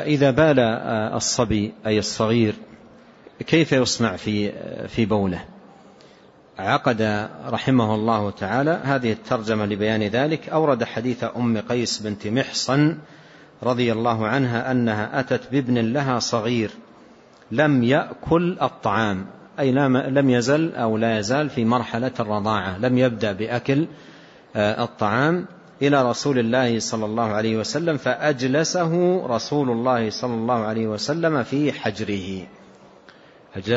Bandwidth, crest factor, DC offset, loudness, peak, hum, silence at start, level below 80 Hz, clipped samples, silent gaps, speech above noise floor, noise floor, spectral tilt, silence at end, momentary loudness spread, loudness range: 8 kHz; 16 dB; under 0.1%; -22 LUFS; -4 dBFS; none; 0 s; -54 dBFS; under 0.1%; none; 29 dB; -50 dBFS; -5.5 dB/octave; 0 s; 7 LU; 3 LU